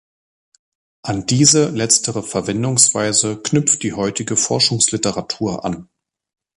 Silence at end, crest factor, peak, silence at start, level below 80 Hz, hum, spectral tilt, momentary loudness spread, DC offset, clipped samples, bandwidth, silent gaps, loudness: 0.75 s; 18 dB; 0 dBFS; 1.05 s; -50 dBFS; none; -3 dB/octave; 11 LU; under 0.1%; under 0.1%; 13.5 kHz; none; -16 LUFS